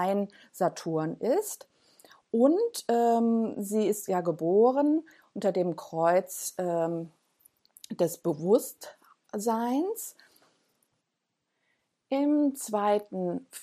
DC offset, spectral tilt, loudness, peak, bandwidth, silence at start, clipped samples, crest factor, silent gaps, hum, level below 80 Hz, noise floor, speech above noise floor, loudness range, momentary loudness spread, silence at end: under 0.1%; -5.5 dB/octave; -28 LUFS; -10 dBFS; 15 kHz; 0 s; under 0.1%; 18 dB; none; none; -84 dBFS; -82 dBFS; 55 dB; 6 LU; 14 LU; 0 s